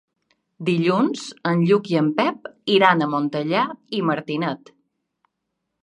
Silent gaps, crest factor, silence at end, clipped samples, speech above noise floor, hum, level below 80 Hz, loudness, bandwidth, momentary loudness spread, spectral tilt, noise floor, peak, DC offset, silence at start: none; 22 dB; 1.25 s; under 0.1%; 58 dB; none; -72 dBFS; -21 LUFS; 10.5 kHz; 10 LU; -6.5 dB/octave; -78 dBFS; 0 dBFS; under 0.1%; 0.6 s